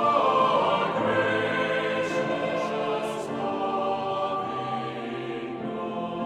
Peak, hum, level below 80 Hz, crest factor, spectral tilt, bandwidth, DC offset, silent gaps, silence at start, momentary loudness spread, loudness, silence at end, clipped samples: -10 dBFS; none; -66 dBFS; 16 dB; -5.5 dB/octave; 12.5 kHz; under 0.1%; none; 0 s; 11 LU; -27 LUFS; 0 s; under 0.1%